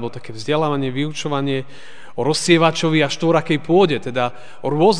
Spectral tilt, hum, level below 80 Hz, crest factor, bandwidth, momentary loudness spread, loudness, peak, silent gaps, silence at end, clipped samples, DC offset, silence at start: -5 dB/octave; none; -60 dBFS; 18 dB; 10 kHz; 13 LU; -18 LUFS; 0 dBFS; none; 0 s; under 0.1%; 3%; 0 s